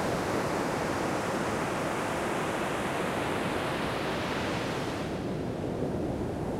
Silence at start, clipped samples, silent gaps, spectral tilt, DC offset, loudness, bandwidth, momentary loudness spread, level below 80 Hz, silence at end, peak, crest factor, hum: 0 s; under 0.1%; none; -5 dB/octave; under 0.1%; -31 LUFS; 16.5 kHz; 3 LU; -50 dBFS; 0 s; -18 dBFS; 14 dB; none